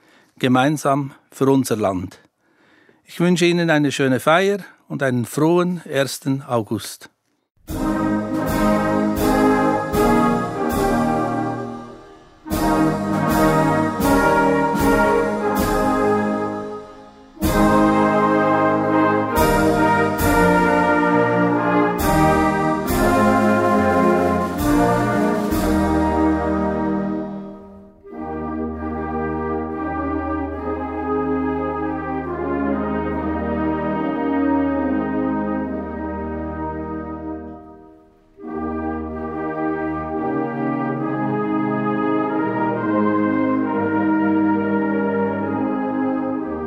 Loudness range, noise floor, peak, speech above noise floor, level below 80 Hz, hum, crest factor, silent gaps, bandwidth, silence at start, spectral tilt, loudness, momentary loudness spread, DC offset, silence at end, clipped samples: 9 LU; -57 dBFS; -2 dBFS; 38 dB; -36 dBFS; none; 18 dB; 7.51-7.55 s; 16 kHz; 0.4 s; -6 dB/octave; -19 LUFS; 11 LU; under 0.1%; 0 s; under 0.1%